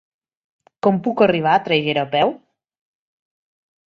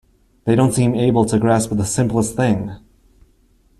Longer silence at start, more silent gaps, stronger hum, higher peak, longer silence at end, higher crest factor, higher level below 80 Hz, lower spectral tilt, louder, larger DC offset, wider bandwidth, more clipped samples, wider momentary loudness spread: first, 0.85 s vs 0.45 s; neither; neither; about the same, -2 dBFS vs -2 dBFS; first, 1.6 s vs 1 s; about the same, 20 dB vs 16 dB; second, -62 dBFS vs -44 dBFS; about the same, -7.5 dB/octave vs -6.5 dB/octave; about the same, -18 LUFS vs -17 LUFS; neither; second, 7 kHz vs 13 kHz; neither; about the same, 4 LU vs 6 LU